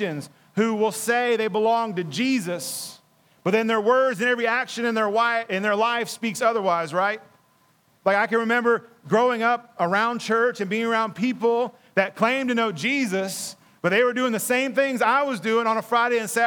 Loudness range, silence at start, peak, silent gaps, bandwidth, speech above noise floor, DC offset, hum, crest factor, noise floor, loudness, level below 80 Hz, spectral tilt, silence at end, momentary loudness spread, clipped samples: 2 LU; 0 s; -6 dBFS; none; 19.5 kHz; 39 dB; under 0.1%; none; 18 dB; -62 dBFS; -23 LUFS; -82 dBFS; -4 dB/octave; 0 s; 7 LU; under 0.1%